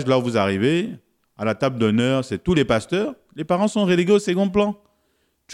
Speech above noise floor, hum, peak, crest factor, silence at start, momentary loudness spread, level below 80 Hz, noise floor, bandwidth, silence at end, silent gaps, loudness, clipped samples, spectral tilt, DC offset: 48 dB; none; -4 dBFS; 16 dB; 0 s; 9 LU; -50 dBFS; -67 dBFS; 12 kHz; 0 s; none; -20 LUFS; under 0.1%; -6 dB/octave; under 0.1%